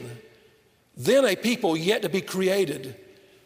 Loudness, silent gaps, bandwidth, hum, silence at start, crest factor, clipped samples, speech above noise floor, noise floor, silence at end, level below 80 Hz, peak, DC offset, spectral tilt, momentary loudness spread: -24 LUFS; none; 16 kHz; none; 0 s; 18 dB; under 0.1%; 37 dB; -60 dBFS; 0.45 s; -70 dBFS; -8 dBFS; under 0.1%; -4.5 dB/octave; 14 LU